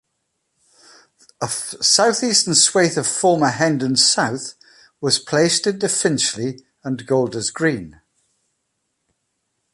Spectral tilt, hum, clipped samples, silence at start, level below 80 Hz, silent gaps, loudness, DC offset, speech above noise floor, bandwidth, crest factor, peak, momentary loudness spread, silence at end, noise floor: -2.5 dB/octave; none; under 0.1%; 1.4 s; -60 dBFS; none; -17 LUFS; under 0.1%; 55 dB; 11.5 kHz; 20 dB; 0 dBFS; 14 LU; 1.85 s; -73 dBFS